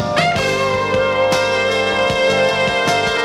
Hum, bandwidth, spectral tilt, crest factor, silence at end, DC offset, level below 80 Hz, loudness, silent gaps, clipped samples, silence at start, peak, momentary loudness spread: 50 Hz at -40 dBFS; 14.5 kHz; -3.5 dB/octave; 14 dB; 0 s; under 0.1%; -44 dBFS; -15 LUFS; none; under 0.1%; 0 s; -2 dBFS; 2 LU